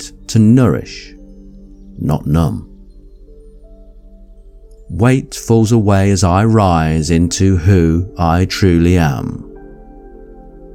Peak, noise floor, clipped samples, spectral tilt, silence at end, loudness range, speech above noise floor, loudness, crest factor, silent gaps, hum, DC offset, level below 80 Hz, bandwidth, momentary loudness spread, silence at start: 0 dBFS; -38 dBFS; under 0.1%; -6.5 dB/octave; 0 s; 10 LU; 26 dB; -13 LUFS; 14 dB; none; none; under 0.1%; -30 dBFS; 15 kHz; 13 LU; 0 s